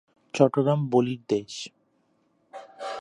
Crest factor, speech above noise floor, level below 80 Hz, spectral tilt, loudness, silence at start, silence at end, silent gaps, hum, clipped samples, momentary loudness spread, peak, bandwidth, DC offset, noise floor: 22 dB; 45 dB; -74 dBFS; -6.5 dB/octave; -25 LUFS; 0.35 s; 0 s; none; none; under 0.1%; 23 LU; -4 dBFS; 11 kHz; under 0.1%; -68 dBFS